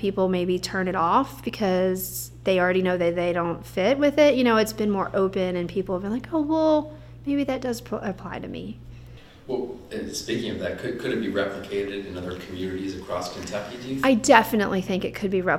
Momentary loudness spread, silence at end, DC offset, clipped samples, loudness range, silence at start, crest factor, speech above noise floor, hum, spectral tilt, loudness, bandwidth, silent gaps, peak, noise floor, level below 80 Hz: 14 LU; 0 s; under 0.1%; under 0.1%; 9 LU; 0 s; 24 dB; 21 dB; none; -5 dB/octave; -24 LUFS; 17 kHz; none; 0 dBFS; -45 dBFS; -50 dBFS